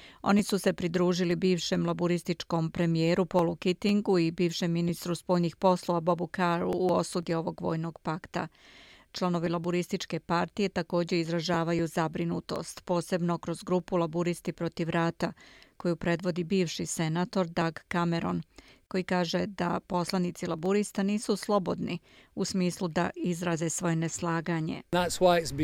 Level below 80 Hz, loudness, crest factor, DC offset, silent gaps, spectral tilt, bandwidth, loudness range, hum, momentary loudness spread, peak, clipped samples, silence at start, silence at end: -60 dBFS; -30 LUFS; 20 dB; under 0.1%; none; -5.5 dB/octave; 15.5 kHz; 3 LU; none; 8 LU; -10 dBFS; under 0.1%; 0 s; 0 s